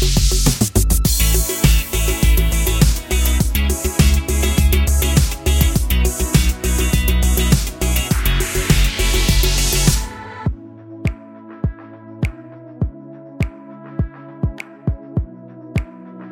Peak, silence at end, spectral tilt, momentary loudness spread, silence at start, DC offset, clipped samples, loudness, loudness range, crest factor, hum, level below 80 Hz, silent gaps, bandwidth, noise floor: 0 dBFS; 0 s; -4 dB/octave; 14 LU; 0 s; under 0.1%; under 0.1%; -18 LUFS; 11 LU; 16 dB; none; -18 dBFS; none; 17 kHz; -37 dBFS